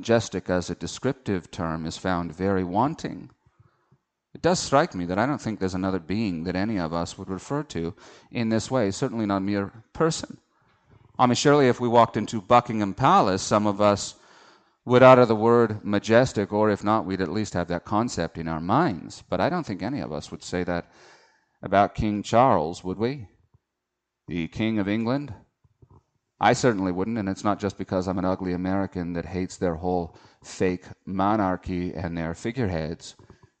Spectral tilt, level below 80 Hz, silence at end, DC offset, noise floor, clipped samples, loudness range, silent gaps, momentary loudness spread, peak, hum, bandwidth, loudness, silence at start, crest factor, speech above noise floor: -6 dB/octave; -52 dBFS; 0.5 s; under 0.1%; -83 dBFS; under 0.1%; 8 LU; none; 13 LU; -2 dBFS; none; 9 kHz; -24 LUFS; 0 s; 22 dB; 59 dB